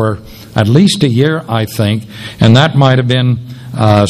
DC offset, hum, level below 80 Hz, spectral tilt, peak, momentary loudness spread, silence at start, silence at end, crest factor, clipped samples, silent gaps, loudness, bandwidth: under 0.1%; none; -42 dBFS; -6.5 dB/octave; 0 dBFS; 12 LU; 0 s; 0 s; 10 dB; 0.8%; none; -11 LUFS; 14.5 kHz